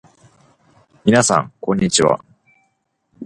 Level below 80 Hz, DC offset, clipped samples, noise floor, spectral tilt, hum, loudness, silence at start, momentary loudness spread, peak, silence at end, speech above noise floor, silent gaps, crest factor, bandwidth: -50 dBFS; under 0.1%; under 0.1%; -68 dBFS; -4 dB/octave; none; -16 LUFS; 1.05 s; 8 LU; 0 dBFS; 0 s; 52 dB; none; 20 dB; 11.5 kHz